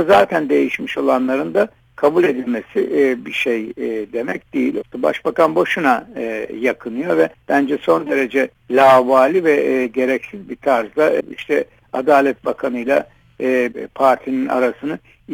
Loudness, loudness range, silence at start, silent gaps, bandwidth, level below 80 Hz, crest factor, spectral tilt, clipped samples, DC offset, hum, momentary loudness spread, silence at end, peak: -17 LUFS; 4 LU; 0 s; none; 19 kHz; -58 dBFS; 16 dB; -5.5 dB/octave; under 0.1%; under 0.1%; none; 10 LU; 0 s; 0 dBFS